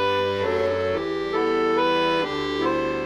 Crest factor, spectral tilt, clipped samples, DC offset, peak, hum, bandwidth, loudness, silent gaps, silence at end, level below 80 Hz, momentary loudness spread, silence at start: 12 dB; -5.5 dB/octave; under 0.1%; under 0.1%; -10 dBFS; none; 12 kHz; -23 LUFS; none; 0 s; -50 dBFS; 5 LU; 0 s